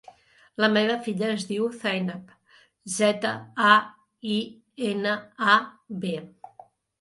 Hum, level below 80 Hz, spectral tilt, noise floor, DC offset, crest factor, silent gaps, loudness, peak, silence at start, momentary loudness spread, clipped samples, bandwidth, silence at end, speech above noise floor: none; -74 dBFS; -4 dB/octave; -53 dBFS; under 0.1%; 24 dB; none; -25 LUFS; -2 dBFS; 0.6 s; 17 LU; under 0.1%; 11.5 kHz; 0.7 s; 28 dB